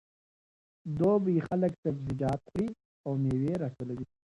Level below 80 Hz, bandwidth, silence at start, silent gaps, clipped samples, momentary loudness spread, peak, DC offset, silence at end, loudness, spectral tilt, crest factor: -58 dBFS; 11 kHz; 0.85 s; 1.78-1.83 s, 2.85-3.04 s; under 0.1%; 12 LU; -16 dBFS; under 0.1%; 0.3 s; -31 LUFS; -9.5 dB/octave; 16 dB